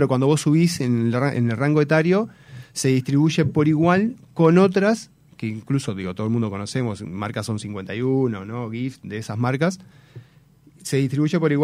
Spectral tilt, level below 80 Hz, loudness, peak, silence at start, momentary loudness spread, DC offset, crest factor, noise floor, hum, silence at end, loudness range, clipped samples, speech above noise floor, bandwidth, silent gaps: -6.5 dB/octave; -60 dBFS; -21 LUFS; -4 dBFS; 0 s; 12 LU; under 0.1%; 18 dB; -53 dBFS; none; 0 s; 7 LU; under 0.1%; 32 dB; 15.5 kHz; none